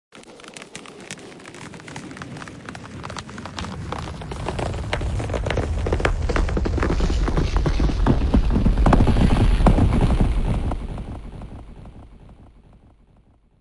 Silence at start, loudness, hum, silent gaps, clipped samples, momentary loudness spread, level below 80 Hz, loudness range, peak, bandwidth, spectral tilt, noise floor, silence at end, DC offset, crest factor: 0.15 s; -22 LUFS; none; none; under 0.1%; 20 LU; -24 dBFS; 15 LU; -4 dBFS; 11.5 kHz; -7 dB/octave; -55 dBFS; 1.25 s; under 0.1%; 18 dB